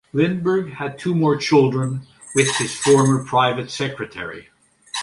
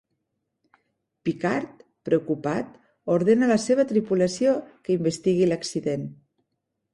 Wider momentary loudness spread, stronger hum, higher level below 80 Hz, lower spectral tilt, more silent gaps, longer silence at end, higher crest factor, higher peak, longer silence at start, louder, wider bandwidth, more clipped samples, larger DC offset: first, 14 LU vs 11 LU; neither; first, -58 dBFS vs -64 dBFS; about the same, -5 dB/octave vs -6 dB/octave; neither; second, 0 s vs 0.8 s; about the same, 18 dB vs 16 dB; first, -2 dBFS vs -8 dBFS; second, 0.15 s vs 1.25 s; first, -19 LUFS vs -24 LUFS; about the same, 11.5 kHz vs 11.5 kHz; neither; neither